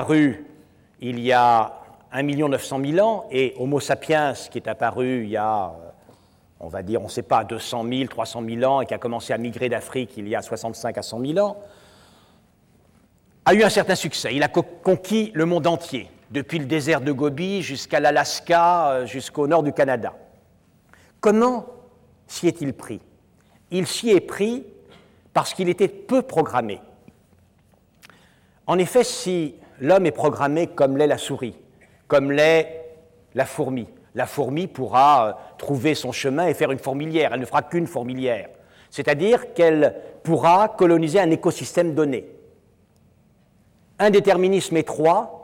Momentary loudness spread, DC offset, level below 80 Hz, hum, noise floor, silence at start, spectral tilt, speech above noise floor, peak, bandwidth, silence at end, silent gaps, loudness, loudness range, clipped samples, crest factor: 14 LU; under 0.1%; -62 dBFS; none; -58 dBFS; 0 s; -5 dB/octave; 38 dB; -8 dBFS; 17 kHz; 0 s; none; -21 LUFS; 6 LU; under 0.1%; 14 dB